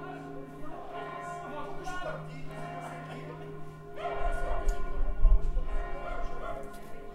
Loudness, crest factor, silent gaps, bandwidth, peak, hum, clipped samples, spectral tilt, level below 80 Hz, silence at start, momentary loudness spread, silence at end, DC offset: -38 LUFS; 20 dB; none; 9 kHz; -10 dBFS; none; under 0.1%; -6.5 dB/octave; -32 dBFS; 0 s; 12 LU; 0 s; under 0.1%